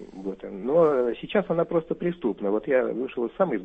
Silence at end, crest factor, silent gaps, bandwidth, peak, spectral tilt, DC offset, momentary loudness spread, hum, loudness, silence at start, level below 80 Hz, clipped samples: 0 s; 16 dB; none; 3.9 kHz; -8 dBFS; -9 dB/octave; under 0.1%; 11 LU; none; -25 LUFS; 0 s; -58 dBFS; under 0.1%